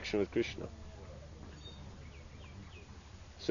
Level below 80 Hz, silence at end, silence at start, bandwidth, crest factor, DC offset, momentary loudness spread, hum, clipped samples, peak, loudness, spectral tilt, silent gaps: -54 dBFS; 0 s; 0 s; 7.2 kHz; 26 dB; under 0.1%; 18 LU; none; under 0.1%; -16 dBFS; -43 LUFS; -5 dB/octave; none